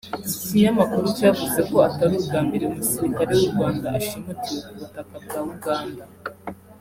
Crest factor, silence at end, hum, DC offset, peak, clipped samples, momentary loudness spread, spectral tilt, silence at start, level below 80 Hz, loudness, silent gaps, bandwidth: 20 dB; 0.05 s; none; under 0.1%; -4 dBFS; under 0.1%; 18 LU; -5.5 dB/octave; 0.05 s; -54 dBFS; -22 LUFS; none; 16.5 kHz